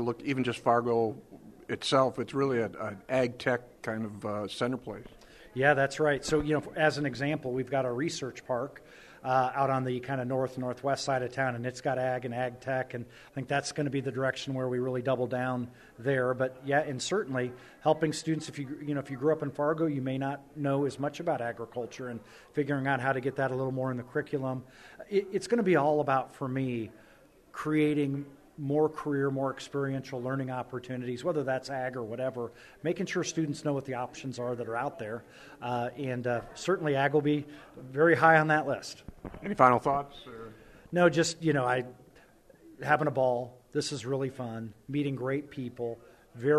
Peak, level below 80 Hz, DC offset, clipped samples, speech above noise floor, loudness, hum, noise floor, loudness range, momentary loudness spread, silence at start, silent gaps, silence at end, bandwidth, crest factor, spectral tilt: -6 dBFS; -62 dBFS; under 0.1%; under 0.1%; 28 dB; -31 LUFS; none; -59 dBFS; 6 LU; 13 LU; 0 s; none; 0 s; 13.5 kHz; 24 dB; -5.5 dB/octave